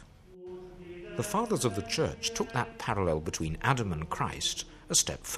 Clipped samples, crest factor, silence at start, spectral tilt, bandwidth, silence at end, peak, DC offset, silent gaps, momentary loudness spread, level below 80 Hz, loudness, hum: under 0.1%; 22 dB; 0 s; -3.5 dB/octave; 15 kHz; 0 s; -10 dBFS; under 0.1%; none; 19 LU; -50 dBFS; -31 LUFS; none